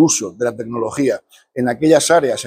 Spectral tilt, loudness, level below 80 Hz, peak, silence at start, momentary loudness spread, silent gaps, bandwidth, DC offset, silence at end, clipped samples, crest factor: -4 dB/octave; -17 LUFS; -58 dBFS; 0 dBFS; 0 s; 11 LU; none; 16 kHz; under 0.1%; 0 s; under 0.1%; 16 dB